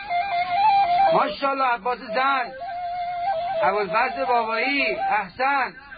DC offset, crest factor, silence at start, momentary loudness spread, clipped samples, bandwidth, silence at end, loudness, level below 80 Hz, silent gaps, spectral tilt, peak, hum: under 0.1%; 14 dB; 0 s; 8 LU; under 0.1%; 5 kHz; 0 s; -22 LUFS; -58 dBFS; none; -8.5 dB/octave; -8 dBFS; none